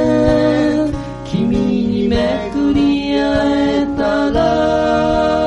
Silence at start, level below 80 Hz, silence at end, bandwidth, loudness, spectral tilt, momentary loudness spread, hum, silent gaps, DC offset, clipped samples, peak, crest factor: 0 s; -32 dBFS; 0 s; 9.6 kHz; -15 LUFS; -7 dB/octave; 5 LU; none; none; under 0.1%; under 0.1%; -2 dBFS; 12 dB